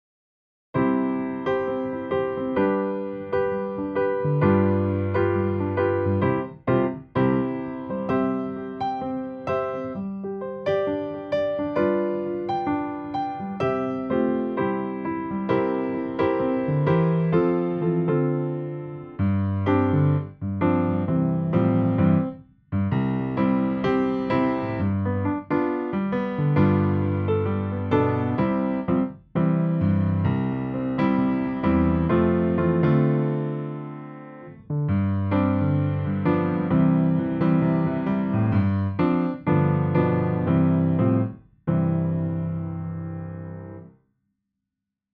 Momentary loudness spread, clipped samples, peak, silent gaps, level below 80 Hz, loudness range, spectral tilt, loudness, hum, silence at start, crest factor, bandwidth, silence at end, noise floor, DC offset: 9 LU; under 0.1%; -8 dBFS; none; -50 dBFS; 4 LU; -11 dB/octave; -24 LUFS; none; 0.75 s; 16 dB; 5.2 kHz; 1.25 s; -85 dBFS; under 0.1%